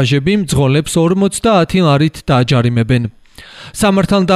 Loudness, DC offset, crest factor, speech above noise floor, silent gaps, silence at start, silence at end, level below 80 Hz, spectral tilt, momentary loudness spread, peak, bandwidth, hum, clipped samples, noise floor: -13 LUFS; under 0.1%; 10 dB; 24 dB; none; 0 s; 0 s; -36 dBFS; -6 dB/octave; 5 LU; -2 dBFS; 13.5 kHz; none; under 0.1%; -36 dBFS